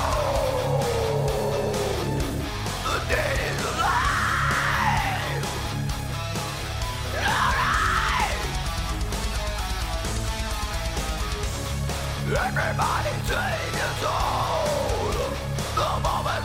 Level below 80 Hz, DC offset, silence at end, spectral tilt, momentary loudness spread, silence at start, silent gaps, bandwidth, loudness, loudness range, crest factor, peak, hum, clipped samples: -32 dBFS; under 0.1%; 0 s; -4 dB/octave; 7 LU; 0 s; none; 16 kHz; -25 LUFS; 4 LU; 16 dB; -8 dBFS; none; under 0.1%